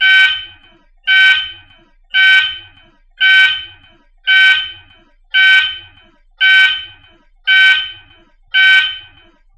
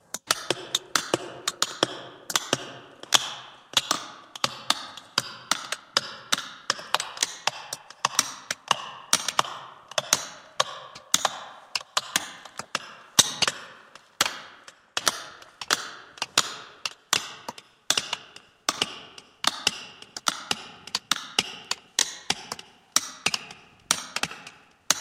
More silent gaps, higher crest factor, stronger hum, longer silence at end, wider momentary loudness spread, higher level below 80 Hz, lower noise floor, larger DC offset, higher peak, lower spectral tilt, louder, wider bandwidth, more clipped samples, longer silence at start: neither; second, 14 dB vs 30 dB; neither; first, 0.55 s vs 0 s; about the same, 14 LU vs 15 LU; first, -52 dBFS vs -70 dBFS; second, -47 dBFS vs -51 dBFS; neither; about the same, 0 dBFS vs 0 dBFS; second, 2 dB/octave vs 0 dB/octave; first, -10 LUFS vs -27 LUFS; second, 10.5 kHz vs 16.5 kHz; neither; second, 0 s vs 0.15 s